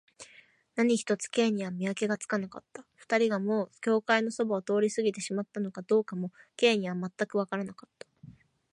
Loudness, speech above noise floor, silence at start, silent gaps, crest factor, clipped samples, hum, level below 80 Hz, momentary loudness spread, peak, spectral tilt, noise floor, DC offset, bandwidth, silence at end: -30 LUFS; 30 dB; 0.2 s; none; 20 dB; under 0.1%; none; -78 dBFS; 15 LU; -10 dBFS; -4.5 dB/octave; -59 dBFS; under 0.1%; 11.5 kHz; 0.4 s